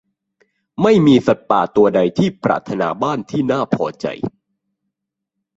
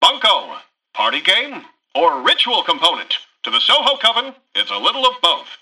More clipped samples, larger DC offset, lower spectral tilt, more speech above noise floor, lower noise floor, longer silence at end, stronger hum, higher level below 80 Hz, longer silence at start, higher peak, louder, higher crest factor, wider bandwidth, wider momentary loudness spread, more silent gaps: neither; neither; first, -7.5 dB/octave vs -0.5 dB/octave; first, 64 dB vs 19 dB; first, -79 dBFS vs -36 dBFS; first, 1.3 s vs 0.05 s; neither; first, -54 dBFS vs -66 dBFS; first, 0.8 s vs 0 s; about the same, -2 dBFS vs -2 dBFS; about the same, -16 LUFS vs -15 LUFS; about the same, 16 dB vs 16 dB; second, 7.8 kHz vs 14.5 kHz; about the same, 12 LU vs 10 LU; neither